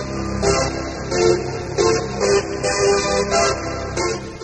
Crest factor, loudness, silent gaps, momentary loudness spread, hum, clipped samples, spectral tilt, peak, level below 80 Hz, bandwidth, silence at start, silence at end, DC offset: 16 dB; -19 LUFS; none; 7 LU; none; under 0.1%; -4 dB/octave; -4 dBFS; -36 dBFS; 9.2 kHz; 0 s; 0 s; under 0.1%